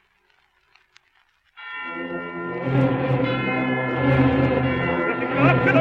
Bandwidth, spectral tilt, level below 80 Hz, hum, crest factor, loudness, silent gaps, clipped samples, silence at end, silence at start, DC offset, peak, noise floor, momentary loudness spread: 5.4 kHz; -9 dB/octave; -46 dBFS; none; 18 dB; -21 LUFS; none; under 0.1%; 0 s; 1.55 s; under 0.1%; -4 dBFS; -63 dBFS; 12 LU